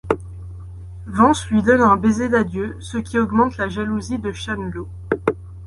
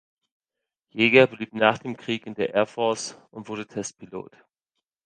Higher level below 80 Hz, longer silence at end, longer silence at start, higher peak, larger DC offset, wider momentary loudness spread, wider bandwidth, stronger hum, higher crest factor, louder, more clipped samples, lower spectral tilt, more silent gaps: first, -38 dBFS vs -66 dBFS; second, 0 s vs 0.8 s; second, 0.05 s vs 0.95 s; about the same, -2 dBFS vs -2 dBFS; neither; about the same, 20 LU vs 21 LU; first, 11.5 kHz vs 10 kHz; neither; second, 18 dB vs 24 dB; first, -19 LUFS vs -23 LUFS; neither; first, -6 dB/octave vs -4 dB/octave; neither